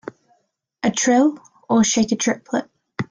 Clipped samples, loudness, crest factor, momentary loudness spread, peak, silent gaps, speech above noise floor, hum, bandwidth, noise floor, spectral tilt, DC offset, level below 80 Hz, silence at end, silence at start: under 0.1%; -19 LUFS; 16 dB; 17 LU; -4 dBFS; none; 48 dB; none; 10 kHz; -66 dBFS; -3.5 dB/octave; under 0.1%; -60 dBFS; 0.1 s; 0.85 s